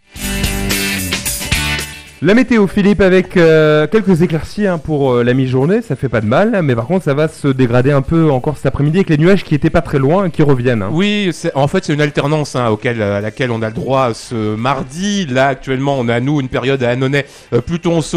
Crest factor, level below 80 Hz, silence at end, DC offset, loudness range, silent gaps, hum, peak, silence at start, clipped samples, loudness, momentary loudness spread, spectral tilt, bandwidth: 12 dB; -34 dBFS; 0 s; under 0.1%; 4 LU; none; none; -2 dBFS; 0.15 s; under 0.1%; -14 LUFS; 7 LU; -6 dB/octave; 15 kHz